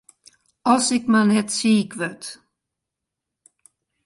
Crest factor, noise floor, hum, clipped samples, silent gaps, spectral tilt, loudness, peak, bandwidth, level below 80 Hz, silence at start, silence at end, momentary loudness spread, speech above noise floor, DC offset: 18 dB; -84 dBFS; none; under 0.1%; none; -4 dB/octave; -20 LUFS; -4 dBFS; 11.5 kHz; -68 dBFS; 0.65 s; 1.7 s; 12 LU; 64 dB; under 0.1%